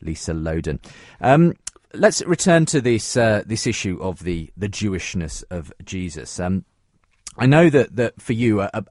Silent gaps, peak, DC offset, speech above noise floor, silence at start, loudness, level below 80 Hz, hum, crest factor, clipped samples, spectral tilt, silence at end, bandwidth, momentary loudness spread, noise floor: none; 0 dBFS; under 0.1%; 43 dB; 0.05 s; -20 LUFS; -42 dBFS; none; 20 dB; under 0.1%; -5.5 dB/octave; 0.05 s; 11.5 kHz; 16 LU; -63 dBFS